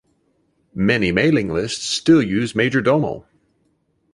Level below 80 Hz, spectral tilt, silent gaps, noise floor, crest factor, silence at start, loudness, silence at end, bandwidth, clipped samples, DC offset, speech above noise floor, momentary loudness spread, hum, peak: -48 dBFS; -5.5 dB/octave; none; -65 dBFS; 18 dB; 0.75 s; -18 LUFS; 0.95 s; 11.5 kHz; under 0.1%; under 0.1%; 47 dB; 8 LU; none; -2 dBFS